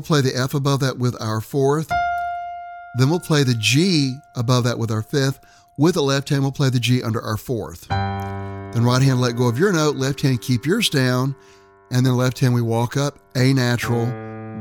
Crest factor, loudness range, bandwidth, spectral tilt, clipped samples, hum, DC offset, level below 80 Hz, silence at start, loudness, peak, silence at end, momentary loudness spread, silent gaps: 16 dB; 2 LU; 17.5 kHz; -5.5 dB/octave; under 0.1%; none; under 0.1%; -50 dBFS; 0 s; -20 LUFS; -4 dBFS; 0 s; 10 LU; none